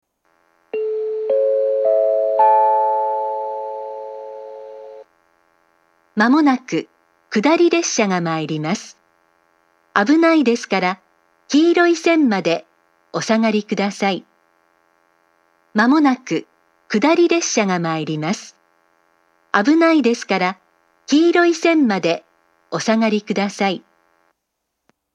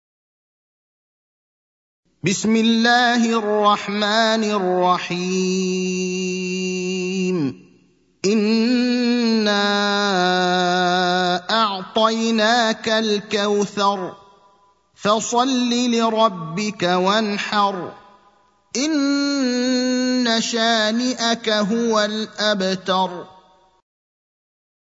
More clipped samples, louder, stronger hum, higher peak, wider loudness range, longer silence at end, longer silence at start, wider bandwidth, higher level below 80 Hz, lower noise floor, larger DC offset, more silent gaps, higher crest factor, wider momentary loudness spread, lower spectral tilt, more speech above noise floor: neither; about the same, -17 LUFS vs -19 LUFS; neither; about the same, 0 dBFS vs -2 dBFS; about the same, 5 LU vs 4 LU; second, 1.4 s vs 1.55 s; second, 0.75 s vs 2.2 s; first, 9.8 kHz vs 8 kHz; second, -78 dBFS vs -68 dBFS; first, -76 dBFS vs -57 dBFS; neither; neither; about the same, 18 dB vs 18 dB; first, 14 LU vs 6 LU; about the same, -4.5 dB/octave vs -4 dB/octave; first, 60 dB vs 39 dB